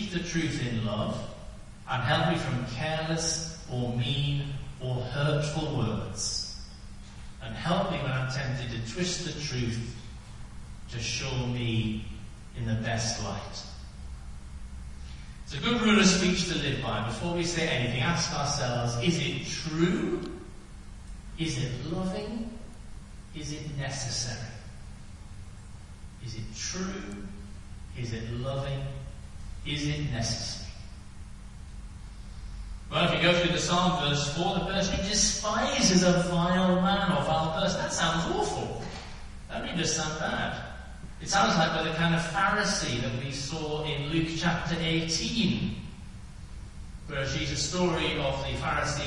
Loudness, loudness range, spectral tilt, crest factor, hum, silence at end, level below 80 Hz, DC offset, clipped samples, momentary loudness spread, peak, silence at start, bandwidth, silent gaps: -29 LUFS; 11 LU; -4 dB/octave; 20 dB; none; 0 s; -44 dBFS; under 0.1%; under 0.1%; 21 LU; -10 dBFS; 0 s; 11.5 kHz; none